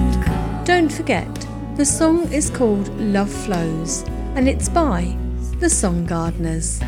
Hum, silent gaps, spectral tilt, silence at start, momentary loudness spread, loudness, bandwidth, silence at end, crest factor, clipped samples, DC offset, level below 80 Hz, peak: none; none; -5 dB/octave; 0 s; 8 LU; -20 LUFS; 16 kHz; 0 s; 16 dB; under 0.1%; under 0.1%; -26 dBFS; -4 dBFS